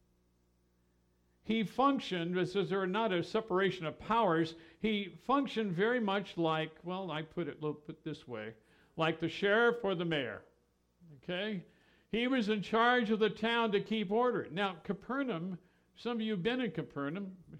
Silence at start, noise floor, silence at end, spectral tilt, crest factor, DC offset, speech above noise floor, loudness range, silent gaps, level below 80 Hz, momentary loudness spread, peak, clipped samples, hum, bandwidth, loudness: 1.45 s; -73 dBFS; 0 s; -6.5 dB/octave; 18 dB; under 0.1%; 40 dB; 4 LU; none; -70 dBFS; 14 LU; -16 dBFS; under 0.1%; 60 Hz at -65 dBFS; 10.5 kHz; -34 LUFS